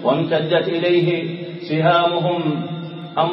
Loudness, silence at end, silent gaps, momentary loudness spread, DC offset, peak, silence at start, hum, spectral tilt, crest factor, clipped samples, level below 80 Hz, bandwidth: -19 LUFS; 0 s; none; 12 LU; under 0.1%; -4 dBFS; 0 s; none; -4.5 dB/octave; 16 dB; under 0.1%; -70 dBFS; 5.8 kHz